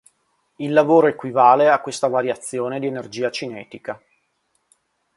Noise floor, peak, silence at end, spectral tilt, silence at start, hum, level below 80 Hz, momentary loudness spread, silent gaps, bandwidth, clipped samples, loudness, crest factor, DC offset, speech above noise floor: -69 dBFS; 0 dBFS; 1.2 s; -5 dB/octave; 0.6 s; none; -68 dBFS; 19 LU; none; 11.5 kHz; under 0.1%; -18 LUFS; 20 dB; under 0.1%; 50 dB